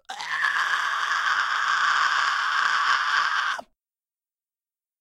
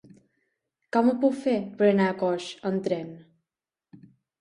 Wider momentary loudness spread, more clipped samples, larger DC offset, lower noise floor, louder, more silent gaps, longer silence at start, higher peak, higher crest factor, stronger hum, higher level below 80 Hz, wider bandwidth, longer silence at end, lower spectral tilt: second, 5 LU vs 9 LU; neither; neither; about the same, under -90 dBFS vs -90 dBFS; first, -22 LUFS vs -25 LUFS; neither; second, 0.1 s vs 0.95 s; about the same, -8 dBFS vs -8 dBFS; about the same, 18 dB vs 18 dB; neither; second, -78 dBFS vs -72 dBFS; first, 15 kHz vs 11 kHz; first, 1.35 s vs 0.45 s; second, 2 dB/octave vs -7 dB/octave